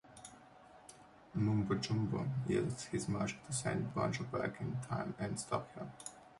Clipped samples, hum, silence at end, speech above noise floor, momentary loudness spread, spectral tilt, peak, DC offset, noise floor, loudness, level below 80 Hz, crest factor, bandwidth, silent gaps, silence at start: under 0.1%; none; 0 s; 22 dB; 19 LU; -5.5 dB/octave; -20 dBFS; under 0.1%; -60 dBFS; -39 LUFS; -64 dBFS; 18 dB; 11.5 kHz; none; 0.05 s